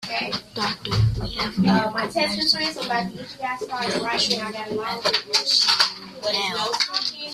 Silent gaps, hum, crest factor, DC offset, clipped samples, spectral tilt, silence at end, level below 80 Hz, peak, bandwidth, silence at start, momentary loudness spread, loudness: none; none; 20 dB; under 0.1%; under 0.1%; -3.5 dB/octave; 0 s; -44 dBFS; -2 dBFS; 15 kHz; 0 s; 10 LU; -22 LUFS